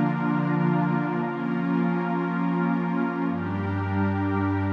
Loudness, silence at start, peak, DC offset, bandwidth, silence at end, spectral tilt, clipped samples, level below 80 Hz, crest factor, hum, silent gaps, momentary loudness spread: -25 LUFS; 0 s; -12 dBFS; under 0.1%; 5.4 kHz; 0 s; -10 dB/octave; under 0.1%; -72 dBFS; 12 dB; none; none; 4 LU